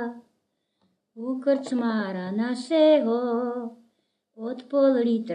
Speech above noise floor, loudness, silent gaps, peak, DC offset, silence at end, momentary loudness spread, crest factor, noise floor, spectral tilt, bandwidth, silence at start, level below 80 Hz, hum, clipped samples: 52 dB; -24 LUFS; none; -10 dBFS; under 0.1%; 0 s; 16 LU; 16 dB; -75 dBFS; -6.5 dB/octave; 10 kHz; 0 s; -86 dBFS; none; under 0.1%